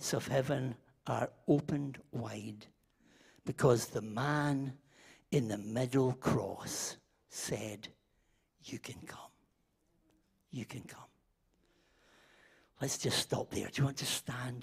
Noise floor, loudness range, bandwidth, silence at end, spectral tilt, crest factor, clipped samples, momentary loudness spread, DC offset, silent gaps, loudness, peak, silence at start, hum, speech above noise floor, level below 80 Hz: -77 dBFS; 16 LU; 15.5 kHz; 0 s; -5 dB/octave; 22 dB; under 0.1%; 17 LU; under 0.1%; none; -36 LUFS; -16 dBFS; 0 s; none; 41 dB; -66 dBFS